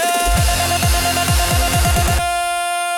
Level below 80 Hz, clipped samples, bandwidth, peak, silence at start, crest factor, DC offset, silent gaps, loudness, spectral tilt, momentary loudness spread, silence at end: -22 dBFS; under 0.1%; 18 kHz; -4 dBFS; 0 s; 12 dB; under 0.1%; none; -16 LUFS; -3.5 dB/octave; 3 LU; 0 s